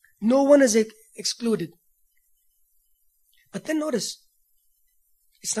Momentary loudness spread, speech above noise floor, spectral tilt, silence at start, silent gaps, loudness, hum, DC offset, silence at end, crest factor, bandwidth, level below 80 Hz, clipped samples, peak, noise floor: 20 LU; 45 dB; -3.5 dB/octave; 0.2 s; none; -23 LUFS; none; under 0.1%; 0 s; 22 dB; 14 kHz; -72 dBFS; under 0.1%; -4 dBFS; -67 dBFS